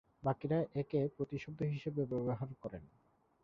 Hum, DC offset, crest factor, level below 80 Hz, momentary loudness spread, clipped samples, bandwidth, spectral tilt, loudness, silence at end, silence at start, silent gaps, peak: none; under 0.1%; 18 dB; -66 dBFS; 10 LU; under 0.1%; 6.8 kHz; -8.5 dB/octave; -39 LUFS; 0.6 s; 0.2 s; none; -20 dBFS